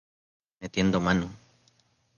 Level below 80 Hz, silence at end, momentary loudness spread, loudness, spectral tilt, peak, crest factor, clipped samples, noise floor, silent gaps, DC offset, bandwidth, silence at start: -50 dBFS; 0.8 s; 15 LU; -27 LUFS; -6 dB/octave; -10 dBFS; 20 dB; under 0.1%; -67 dBFS; none; under 0.1%; 7.2 kHz; 0.6 s